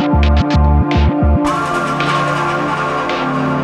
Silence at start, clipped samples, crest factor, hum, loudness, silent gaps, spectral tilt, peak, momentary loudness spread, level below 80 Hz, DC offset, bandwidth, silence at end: 0 s; under 0.1%; 12 dB; none; -15 LUFS; none; -7 dB/octave; -2 dBFS; 4 LU; -18 dBFS; under 0.1%; 10.5 kHz; 0 s